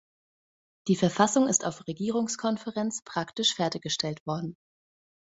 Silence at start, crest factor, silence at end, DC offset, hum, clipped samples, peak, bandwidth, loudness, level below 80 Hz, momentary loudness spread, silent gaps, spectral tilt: 0.85 s; 24 dB; 0.85 s; under 0.1%; none; under 0.1%; -6 dBFS; 8.2 kHz; -28 LUFS; -68 dBFS; 11 LU; 3.02-3.06 s, 4.20-4.26 s; -3.5 dB/octave